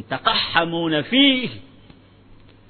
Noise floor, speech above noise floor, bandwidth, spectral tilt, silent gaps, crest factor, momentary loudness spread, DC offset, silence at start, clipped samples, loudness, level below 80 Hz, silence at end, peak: -48 dBFS; 29 dB; 4.6 kHz; -9.5 dB/octave; none; 20 dB; 8 LU; under 0.1%; 0 s; under 0.1%; -18 LUFS; -54 dBFS; 0.35 s; 0 dBFS